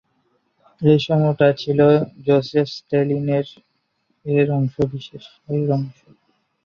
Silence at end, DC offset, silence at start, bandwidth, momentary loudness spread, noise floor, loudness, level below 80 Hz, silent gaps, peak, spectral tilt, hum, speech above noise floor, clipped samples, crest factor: 0.75 s; under 0.1%; 0.8 s; 6.8 kHz; 17 LU; -69 dBFS; -19 LUFS; -56 dBFS; none; -2 dBFS; -8.5 dB/octave; none; 50 dB; under 0.1%; 18 dB